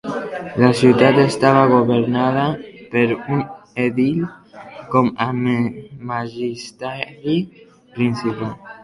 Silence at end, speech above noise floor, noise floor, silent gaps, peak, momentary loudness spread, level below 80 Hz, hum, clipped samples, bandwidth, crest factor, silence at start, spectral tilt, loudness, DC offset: 0.05 s; 20 dB; -38 dBFS; none; 0 dBFS; 16 LU; -54 dBFS; none; under 0.1%; 11.5 kHz; 18 dB; 0.05 s; -7 dB/octave; -18 LUFS; under 0.1%